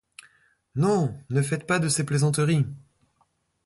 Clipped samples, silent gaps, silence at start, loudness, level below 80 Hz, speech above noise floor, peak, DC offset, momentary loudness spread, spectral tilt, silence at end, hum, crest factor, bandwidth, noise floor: under 0.1%; none; 0.75 s; -25 LUFS; -60 dBFS; 46 dB; -10 dBFS; under 0.1%; 7 LU; -5.5 dB/octave; 0.85 s; none; 16 dB; 11.5 kHz; -69 dBFS